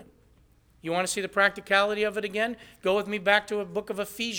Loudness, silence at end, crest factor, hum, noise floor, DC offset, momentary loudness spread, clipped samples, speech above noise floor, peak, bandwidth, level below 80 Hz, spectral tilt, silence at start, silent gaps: -26 LUFS; 0 s; 22 dB; none; -60 dBFS; under 0.1%; 9 LU; under 0.1%; 33 dB; -6 dBFS; 19.5 kHz; -62 dBFS; -3 dB/octave; 0 s; none